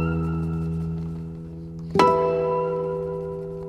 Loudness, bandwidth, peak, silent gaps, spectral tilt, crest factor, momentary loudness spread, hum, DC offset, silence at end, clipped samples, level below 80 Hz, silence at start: -24 LUFS; 10.5 kHz; -2 dBFS; none; -7.5 dB/octave; 22 dB; 16 LU; none; under 0.1%; 0 s; under 0.1%; -44 dBFS; 0 s